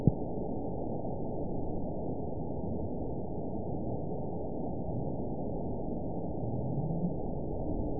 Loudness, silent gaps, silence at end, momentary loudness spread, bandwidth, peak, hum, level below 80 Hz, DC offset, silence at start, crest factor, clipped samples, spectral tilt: -37 LUFS; none; 0 s; 3 LU; 1 kHz; -10 dBFS; none; -46 dBFS; 1%; 0 s; 26 dB; under 0.1%; -6 dB/octave